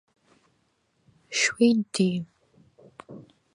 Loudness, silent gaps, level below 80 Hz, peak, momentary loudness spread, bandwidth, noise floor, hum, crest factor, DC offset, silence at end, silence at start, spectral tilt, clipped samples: -24 LUFS; none; -72 dBFS; -8 dBFS; 25 LU; 11 kHz; -70 dBFS; none; 20 dB; under 0.1%; 0.35 s; 1.3 s; -4 dB/octave; under 0.1%